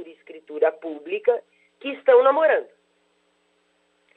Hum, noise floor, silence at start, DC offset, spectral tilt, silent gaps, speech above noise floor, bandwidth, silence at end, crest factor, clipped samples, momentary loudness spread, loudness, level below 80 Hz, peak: none; -66 dBFS; 0 s; under 0.1%; -5 dB/octave; none; 46 dB; 4.1 kHz; 1.55 s; 18 dB; under 0.1%; 19 LU; -21 LUFS; -86 dBFS; -6 dBFS